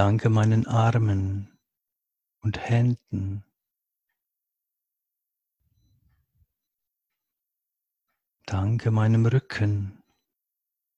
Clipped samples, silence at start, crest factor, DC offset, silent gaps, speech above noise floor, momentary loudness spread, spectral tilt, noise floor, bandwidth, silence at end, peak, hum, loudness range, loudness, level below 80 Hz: under 0.1%; 0 s; 22 dB; under 0.1%; none; 63 dB; 14 LU; -8 dB/octave; -85 dBFS; 7.8 kHz; 1.05 s; -6 dBFS; none; 12 LU; -25 LUFS; -48 dBFS